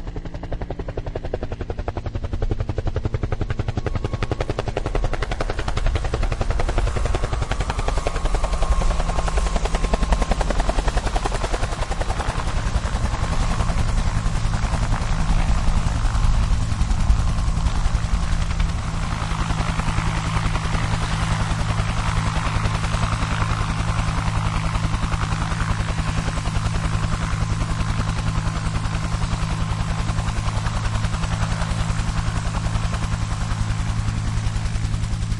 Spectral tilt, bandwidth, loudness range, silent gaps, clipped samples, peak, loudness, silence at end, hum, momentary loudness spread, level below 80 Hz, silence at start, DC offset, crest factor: -5.5 dB/octave; 11.5 kHz; 3 LU; none; under 0.1%; -4 dBFS; -24 LUFS; 0 s; none; 4 LU; -24 dBFS; 0 s; under 0.1%; 18 dB